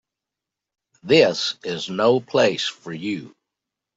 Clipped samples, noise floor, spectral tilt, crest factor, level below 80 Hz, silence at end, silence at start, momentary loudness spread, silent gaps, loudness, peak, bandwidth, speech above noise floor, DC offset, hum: under 0.1%; -86 dBFS; -4.5 dB/octave; 20 dB; -66 dBFS; 0.7 s; 1.05 s; 13 LU; none; -20 LUFS; -4 dBFS; 8 kHz; 66 dB; under 0.1%; none